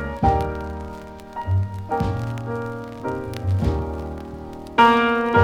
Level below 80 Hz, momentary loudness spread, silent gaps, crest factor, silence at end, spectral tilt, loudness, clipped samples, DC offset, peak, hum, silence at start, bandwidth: -36 dBFS; 18 LU; none; 20 dB; 0 s; -7 dB/octave; -22 LUFS; under 0.1%; under 0.1%; -2 dBFS; none; 0 s; 13.5 kHz